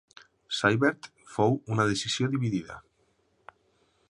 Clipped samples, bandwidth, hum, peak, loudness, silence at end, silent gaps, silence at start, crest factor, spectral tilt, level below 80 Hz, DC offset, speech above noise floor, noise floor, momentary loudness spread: under 0.1%; 11 kHz; none; -6 dBFS; -27 LUFS; 1.3 s; none; 0.5 s; 22 dB; -5 dB/octave; -62 dBFS; under 0.1%; 43 dB; -70 dBFS; 16 LU